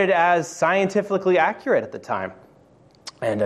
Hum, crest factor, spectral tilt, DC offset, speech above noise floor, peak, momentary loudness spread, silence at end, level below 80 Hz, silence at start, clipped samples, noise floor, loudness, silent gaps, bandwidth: none; 16 dB; -5 dB/octave; under 0.1%; 33 dB; -6 dBFS; 12 LU; 0 s; -68 dBFS; 0 s; under 0.1%; -53 dBFS; -21 LUFS; none; 12.5 kHz